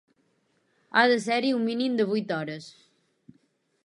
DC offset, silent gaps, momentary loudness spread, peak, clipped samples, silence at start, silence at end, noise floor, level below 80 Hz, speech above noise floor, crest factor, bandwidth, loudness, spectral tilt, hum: under 0.1%; none; 11 LU; -6 dBFS; under 0.1%; 0.95 s; 1.15 s; -70 dBFS; -80 dBFS; 45 dB; 22 dB; 11.5 kHz; -25 LUFS; -5 dB/octave; none